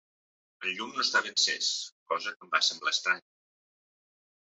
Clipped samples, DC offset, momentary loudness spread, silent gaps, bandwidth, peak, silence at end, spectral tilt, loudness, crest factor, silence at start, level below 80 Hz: under 0.1%; under 0.1%; 9 LU; 1.92-2.06 s, 2.36-2.40 s; 8.4 kHz; -10 dBFS; 1.3 s; 1 dB/octave; -29 LUFS; 24 dB; 0.6 s; -88 dBFS